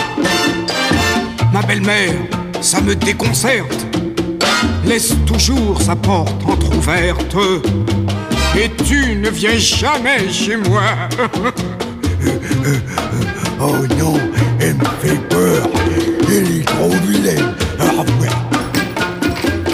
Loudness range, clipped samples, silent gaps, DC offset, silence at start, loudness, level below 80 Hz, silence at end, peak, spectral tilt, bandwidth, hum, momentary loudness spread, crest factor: 2 LU; under 0.1%; none; under 0.1%; 0 s; -15 LUFS; -26 dBFS; 0 s; 0 dBFS; -4.5 dB/octave; 16 kHz; none; 5 LU; 14 dB